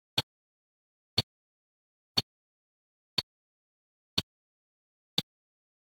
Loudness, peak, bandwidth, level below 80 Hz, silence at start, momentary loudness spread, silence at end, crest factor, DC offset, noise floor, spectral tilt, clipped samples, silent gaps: -34 LUFS; -8 dBFS; 16 kHz; -68 dBFS; 0.15 s; 18 LU; 0.75 s; 32 dB; under 0.1%; under -90 dBFS; -3 dB/octave; under 0.1%; 0.23-1.17 s, 1.23-2.15 s, 2.23-3.17 s, 3.23-4.17 s, 4.23-5.17 s